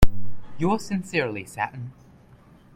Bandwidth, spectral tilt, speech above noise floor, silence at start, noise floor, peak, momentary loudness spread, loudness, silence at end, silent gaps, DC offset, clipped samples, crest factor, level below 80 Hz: 16.5 kHz; -6 dB/octave; 25 dB; 0 s; -52 dBFS; 0 dBFS; 15 LU; -27 LUFS; 0.85 s; none; under 0.1%; under 0.1%; 20 dB; -32 dBFS